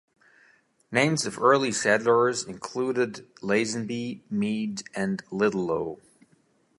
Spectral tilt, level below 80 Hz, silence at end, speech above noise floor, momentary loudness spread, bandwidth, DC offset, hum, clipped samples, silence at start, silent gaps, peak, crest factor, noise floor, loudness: -4.5 dB/octave; -66 dBFS; 0.85 s; 39 dB; 11 LU; 11.5 kHz; under 0.1%; none; under 0.1%; 0.9 s; none; -6 dBFS; 22 dB; -65 dBFS; -26 LUFS